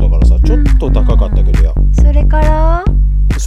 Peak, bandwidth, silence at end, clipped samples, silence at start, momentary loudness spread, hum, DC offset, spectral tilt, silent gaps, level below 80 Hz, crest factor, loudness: 0 dBFS; 7.2 kHz; 0 s; under 0.1%; 0 s; 3 LU; none; under 0.1%; -7.5 dB/octave; none; -8 dBFS; 8 dB; -12 LUFS